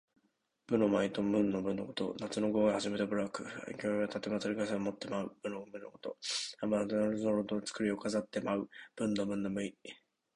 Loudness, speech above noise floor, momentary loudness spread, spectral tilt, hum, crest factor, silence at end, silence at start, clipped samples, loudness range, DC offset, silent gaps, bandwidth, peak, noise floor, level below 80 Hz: -35 LUFS; 43 dB; 12 LU; -5 dB/octave; none; 18 dB; 0.4 s; 0.7 s; under 0.1%; 4 LU; under 0.1%; none; 11 kHz; -16 dBFS; -78 dBFS; -70 dBFS